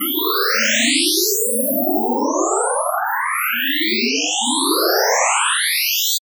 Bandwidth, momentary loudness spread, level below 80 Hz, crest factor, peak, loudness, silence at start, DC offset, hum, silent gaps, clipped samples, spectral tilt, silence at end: over 20 kHz; 5 LU; -80 dBFS; 14 dB; -4 dBFS; -16 LUFS; 0 s; under 0.1%; none; none; under 0.1%; 0 dB/octave; 0.15 s